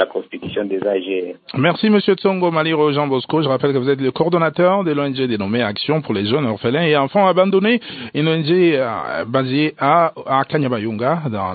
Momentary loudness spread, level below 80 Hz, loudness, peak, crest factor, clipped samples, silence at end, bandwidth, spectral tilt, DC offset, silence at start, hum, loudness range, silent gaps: 6 LU; -60 dBFS; -17 LUFS; -2 dBFS; 16 dB; under 0.1%; 0 s; 4.8 kHz; -11.5 dB/octave; under 0.1%; 0 s; none; 1 LU; none